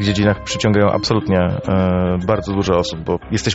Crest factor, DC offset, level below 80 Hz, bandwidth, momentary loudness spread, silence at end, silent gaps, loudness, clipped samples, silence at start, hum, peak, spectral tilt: 16 dB; 0.1%; -38 dBFS; 8 kHz; 4 LU; 0 s; none; -17 LUFS; under 0.1%; 0 s; none; -2 dBFS; -5.5 dB/octave